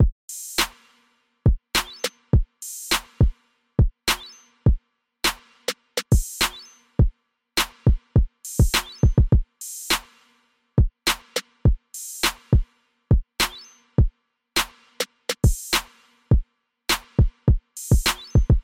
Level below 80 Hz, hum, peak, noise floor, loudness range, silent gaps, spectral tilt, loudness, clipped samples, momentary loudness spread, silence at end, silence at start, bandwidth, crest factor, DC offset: -26 dBFS; none; -6 dBFS; -64 dBFS; 2 LU; 0.12-0.28 s; -4.5 dB/octave; -24 LUFS; under 0.1%; 10 LU; 0 s; 0 s; 17 kHz; 18 dB; under 0.1%